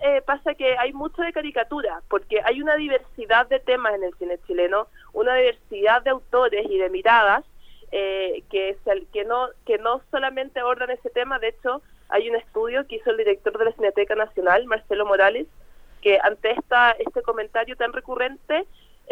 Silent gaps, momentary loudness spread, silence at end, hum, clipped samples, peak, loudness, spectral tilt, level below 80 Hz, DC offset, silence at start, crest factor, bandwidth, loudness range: none; 8 LU; 0 s; none; under 0.1%; -2 dBFS; -22 LUFS; -4.5 dB/octave; -50 dBFS; under 0.1%; 0 s; 20 dB; 5.8 kHz; 5 LU